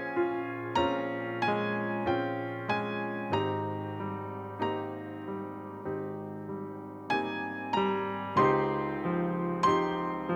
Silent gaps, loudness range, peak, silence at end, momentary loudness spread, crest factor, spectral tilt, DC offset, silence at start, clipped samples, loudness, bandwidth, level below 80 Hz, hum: none; 7 LU; -14 dBFS; 0 s; 12 LU; 18 dB; -7 dB/octave; under 0.1%; 0 s; under 0.1%; -32 LUFS; 8.6 kHz; -64 dBFS; none